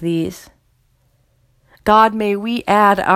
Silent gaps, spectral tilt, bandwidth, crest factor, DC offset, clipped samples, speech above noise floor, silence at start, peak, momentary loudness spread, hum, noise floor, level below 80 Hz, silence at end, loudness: none; -5.5 dB/octave; 15.5 kHz; 18 dB; under 0.1%; under 0.1%; 44 dB; 0 s; 0 dBFS; 10 LU; none; -59 dBFS; -48 dBFS; 0 s; -15 LUFS